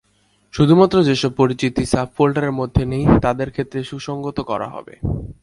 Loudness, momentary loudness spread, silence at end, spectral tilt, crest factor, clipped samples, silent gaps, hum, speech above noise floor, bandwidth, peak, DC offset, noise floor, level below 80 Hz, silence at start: -18 LUFS; 13 LU; 0.1 s; -7 dB/octave; 18 dB; under 0.1%; none; none; 43 dB; 11.5 kHz; 0 dBFS; under 0.1%; -60 dBFS; -36 dBFS; 0.55 s